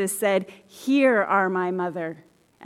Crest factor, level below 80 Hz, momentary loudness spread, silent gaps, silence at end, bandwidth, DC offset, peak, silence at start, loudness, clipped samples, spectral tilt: 16 dB; -76 dBFS; 14 LU; none; 0 s; 16 kHz; under 0.1%; -8 dBFS; 0 s; -23 LUFS; under 0.1%; -4.5 dB/octave